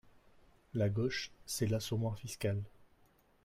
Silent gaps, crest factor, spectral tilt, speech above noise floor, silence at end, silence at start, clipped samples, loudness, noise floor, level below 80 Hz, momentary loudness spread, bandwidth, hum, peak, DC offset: none; 16 dB; -5.5 dB/octave; 33 dB; 0.6 s; 0.75 s; under 0.1%; -37 LUFS; -69 dBFS; -64 dBFS; 8 LU; 16 kHz; none; -22 dBFS; under 0.1%